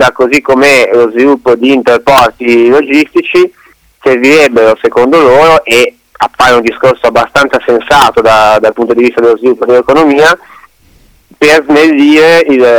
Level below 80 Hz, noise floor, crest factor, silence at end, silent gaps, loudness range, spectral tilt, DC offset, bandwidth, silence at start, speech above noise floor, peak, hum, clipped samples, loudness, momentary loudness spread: -40 dBFS; -43 dBFS; 6 dB; 0 s; none; 1 LU; -4 dB/octave; 0.3%; over 20 kHz; 0 s; 38 dB; 0 dBFS; none; 0.1%; -6 LUFS; 5 LU